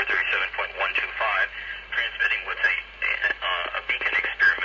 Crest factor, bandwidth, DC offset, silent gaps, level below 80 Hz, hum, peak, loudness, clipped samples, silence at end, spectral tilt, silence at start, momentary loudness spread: 16 dB; 7.4 kHz; under 0.1%; none; -52 dBFS; none; -10 dBFS; -24 LUFS; under 0.1%; 0 s; -2 dB/octave; 0 s; 5 LU